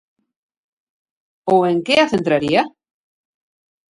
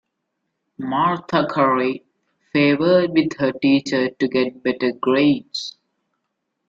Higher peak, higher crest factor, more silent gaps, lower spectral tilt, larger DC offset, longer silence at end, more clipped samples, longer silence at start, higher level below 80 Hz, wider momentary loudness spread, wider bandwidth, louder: first, 0 dBFS vs -4 dBFS; about the same, 20 dB vs 16 dB; neither; about the same, -5.5 dB/octave vs -6 dB/octave; neither; first, 1.3 s vs 1 s; neither; first, 1.45 s vs 0.8 s; about the same, -58 dBFS vs -62 dBFS; about the same, 8 LU vs 9 LU; first, 11.5 kHz vs 7.6 kHz; first, -16 LUFS vs -19 LUFS